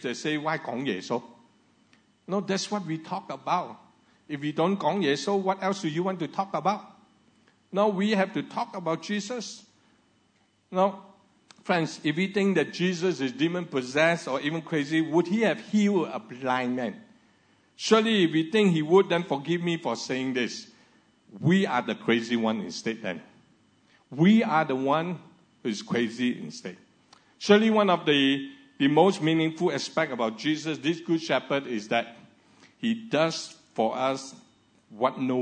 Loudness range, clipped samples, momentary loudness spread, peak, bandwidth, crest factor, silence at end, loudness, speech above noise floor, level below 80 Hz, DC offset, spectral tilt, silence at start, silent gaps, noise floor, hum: 6 LU; under 0.1%; 13 LU; -4 dBFS; 9.4 kHz; 24 dB; 0 s; -26 LUFS; 41 dB; -80 dBFS; under 0.1%; -5.5 dB/octave; 0 s; none; -67 dBFS; none